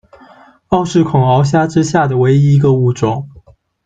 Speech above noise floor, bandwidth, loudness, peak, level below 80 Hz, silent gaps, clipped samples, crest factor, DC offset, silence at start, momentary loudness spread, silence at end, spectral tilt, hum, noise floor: 33 dB; 7.8 kHz; -12 LUFS; -2 dBFS; -44 dBFS; none; under 0.1%; 12 dB; under 0.1%; 0.7 s; 7 LU; 0.55 s; -7.5 dB/octave; none; -44 dBFS